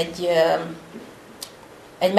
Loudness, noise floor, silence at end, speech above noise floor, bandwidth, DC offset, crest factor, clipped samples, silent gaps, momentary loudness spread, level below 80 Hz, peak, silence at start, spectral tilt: -22 LUFS; -45 dBFS; 0 s; 22 dB; 13 kHz; under 0.1%; 24 dB; under 0.1%; none; 24 LU; -60 dBFS; 0 dBFS; 0 s; -4.5 dB/octave